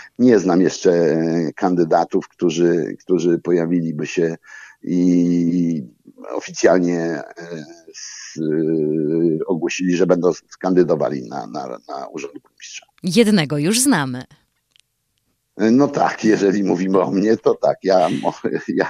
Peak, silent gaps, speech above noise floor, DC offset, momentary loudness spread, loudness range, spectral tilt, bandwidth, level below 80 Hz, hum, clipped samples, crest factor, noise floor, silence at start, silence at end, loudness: 0 dBFS; none; 52 dB; under 0.1%; 17 LU; 4 LU; -5.5 dB/octave; 14.5 kHz; -64 dBFS; none; under 0.1%; 18 dB; -70 dBFS; 0 s; 0 s; -18 LUFS